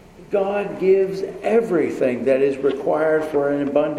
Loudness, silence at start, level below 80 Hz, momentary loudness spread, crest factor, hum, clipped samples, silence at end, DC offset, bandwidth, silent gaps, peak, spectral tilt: -20 LUFS; 0.2 s; -56 dBFS; 5 LU; 14 dB; none; under 0.1%; 0 s; under 0.1%; 11.5 kHz; none; -4 dBFS; -7 dB/octave